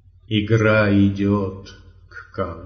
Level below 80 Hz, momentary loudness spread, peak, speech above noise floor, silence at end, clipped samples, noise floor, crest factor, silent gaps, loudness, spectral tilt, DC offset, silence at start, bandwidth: -48 dBFS; 15 LU; -4 dBFS; 23 dB; 0 s; under 0.1%; -42 dBFS; 16 dB; none; -19 LUFS; -6 dB/octave; under 0.1%; 0.3 s; 6.6 kHz